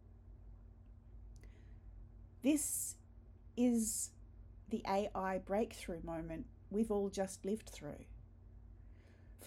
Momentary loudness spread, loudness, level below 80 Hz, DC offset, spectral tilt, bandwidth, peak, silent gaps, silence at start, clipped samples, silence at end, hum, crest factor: 25 LU; -39 LUFS; -58 dBFS; under 0.1%; -4.5 dB/octave; 16.5 kHz; -22 dBFS; none; 0.05 s; under 0.1%; 0 s; none; 20 dB